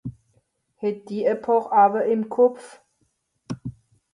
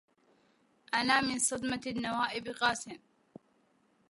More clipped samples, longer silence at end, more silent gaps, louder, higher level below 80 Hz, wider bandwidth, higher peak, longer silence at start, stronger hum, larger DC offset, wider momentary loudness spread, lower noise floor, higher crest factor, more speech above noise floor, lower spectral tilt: neither; second, 0.45 s vs 1.15 s; neither; first, -21 LUFS vs -31 LUFS; first, -60 dBFS vs -68 dBFS; about the same, 11 kHz vs 11.5 kHz; first, -6 dBFS vs -12 dBFS; second, 0.05 s vs 0.9 s; neither; neither; first, 20 LU vs 11 LU; about the same, -70 dBFS vs -71 dBFS; about the same, 18 dB vs 22 dB; first, 50 dB vs 38 dB; first, -7.5 dB/octave vs -2 dB/octave